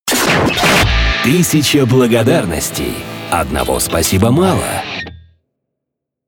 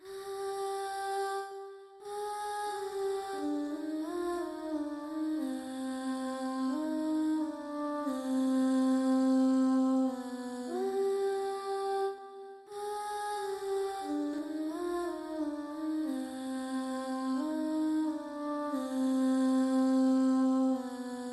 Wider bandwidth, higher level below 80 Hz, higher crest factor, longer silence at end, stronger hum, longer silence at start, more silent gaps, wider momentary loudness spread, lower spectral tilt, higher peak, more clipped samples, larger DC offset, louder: first, over 20 kHz vs 12.5 kHz; first, -26 dBFS vs -74 dBFS; about the same, 12 dB vs 12 dB; first, 1.1 s vs 0 s; neither; about the same, 0.05 s vs 0 s; neither; about the same, 10 LU vs 10 LU; about the same, -4 dB/octave vs -4 dB/octave; first, -2 dBFS vs -20 dBFS; neither; neither; first, -13 LUFS vs -33 LUFS